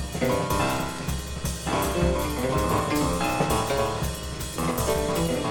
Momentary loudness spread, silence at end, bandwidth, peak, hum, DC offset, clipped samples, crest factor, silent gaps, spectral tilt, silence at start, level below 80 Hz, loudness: 7 LU; 0 s; 19 kHz; -10 dBFS; none; under 0.1%; under 0.1%; 16 dB; none; -5 dB/octave; 0 s; -36 dBFS; -26 LUFS